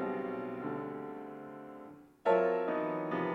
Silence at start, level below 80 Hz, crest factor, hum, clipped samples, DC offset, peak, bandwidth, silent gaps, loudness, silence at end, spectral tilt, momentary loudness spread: 0 s; -74 dBFS; 20 dB; none; under 0.1%; under 0.1%; -16 dBFS; 7.8 kHz; none; -35 LUFS; 0 s; -8 dB/octave; 19 LU